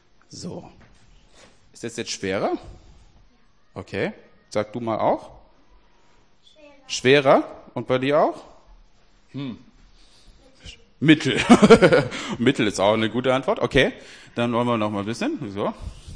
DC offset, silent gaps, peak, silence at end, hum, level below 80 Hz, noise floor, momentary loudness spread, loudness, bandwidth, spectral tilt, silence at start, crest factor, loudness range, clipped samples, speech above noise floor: 0.2%; none; -2 dBFS; 0 s; none; -48 dBFS; -60 dBFS; 20 LU; -20 LUFS; 10.5 kHz; -5.5 dB/octave; 0.3 s; 20 dB; 13 LU; under 0.1%; 39 dB